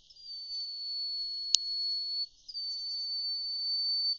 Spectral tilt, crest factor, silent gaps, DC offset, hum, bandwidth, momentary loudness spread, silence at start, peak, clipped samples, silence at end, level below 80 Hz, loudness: 5 dB/octave; 32 dB; none; under 0.1%; none; 7.4 kHz; 9 LU; 0.1 s; -2 dBFS; under 0.1%; 0 s; -74 dBFS; -32 LUFS